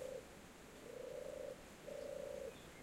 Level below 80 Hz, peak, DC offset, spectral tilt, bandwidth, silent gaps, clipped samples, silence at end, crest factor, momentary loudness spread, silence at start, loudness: -70 dBFS; -38 dBFS; under 0.1%; -4 dB/octave; 16 kHz; none; under 0.1%; 0 s; 14 dB; 9 LU; 0 s; -51 LUFS